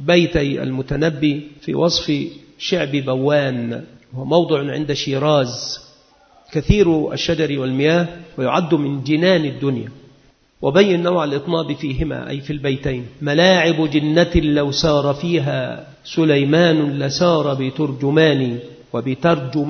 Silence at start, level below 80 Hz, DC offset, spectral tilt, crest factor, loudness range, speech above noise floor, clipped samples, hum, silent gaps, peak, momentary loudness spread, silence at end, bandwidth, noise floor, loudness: 0 s; -38 dBFS; under 0.1%; -6 dB/octave; 18 dB; 3 LU; 35 dB; under 0.1%; none; none; 0 dBFS; 11 LU; 0 s; 6.6 kHz; -53 dBFS; -18 LUFS